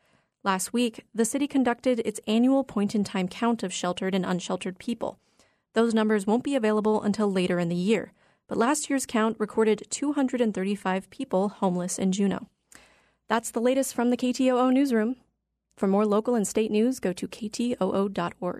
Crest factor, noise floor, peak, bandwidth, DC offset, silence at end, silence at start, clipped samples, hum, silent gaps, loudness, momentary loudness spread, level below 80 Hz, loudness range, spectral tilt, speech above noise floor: 16 dB; -75 dBFS; -10 dBFS; 13.5 kHz; under 0.1%; 0 s; 0.45 s; under 0.1%; none; none; -26 LUFS; 8 LU; -66 dBFS; 3 LU; -5 dB/octave; 50 dB